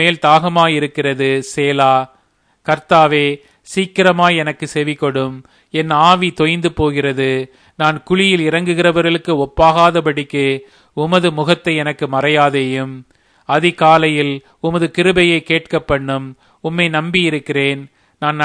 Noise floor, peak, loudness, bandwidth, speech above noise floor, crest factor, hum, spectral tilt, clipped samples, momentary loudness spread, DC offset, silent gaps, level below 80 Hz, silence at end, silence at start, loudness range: -58 dBFS; 0 dBFS; -14 LUFS; 10.5 kHz; 43 dB; 14 dB; none; -5.5 dB/octave; under 0.1%; 11 LU; under 0.1%; none; -44 dBFS; 0 s; 0 s; 2 LU